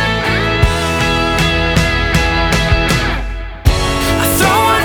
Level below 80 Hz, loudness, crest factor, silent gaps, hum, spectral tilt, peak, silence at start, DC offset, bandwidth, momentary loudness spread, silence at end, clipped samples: -20 dBFS; -13 LUFS; 14 dB; none; none; -4.5 dB/octave; 0 dBFS; 0 s; under 0.1%; over 20 kHz; 5 LU; 0 s; under 0.1%